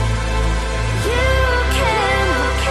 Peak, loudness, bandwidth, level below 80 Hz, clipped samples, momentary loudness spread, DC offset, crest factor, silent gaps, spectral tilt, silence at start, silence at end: -4 dBFS; -17 LUFS; 14 kHz; -20 dBFS; under 0.1%; 4 LU; under 0.1%; 12 dB; none; -4.5 dB/octave; 0 s; 0 s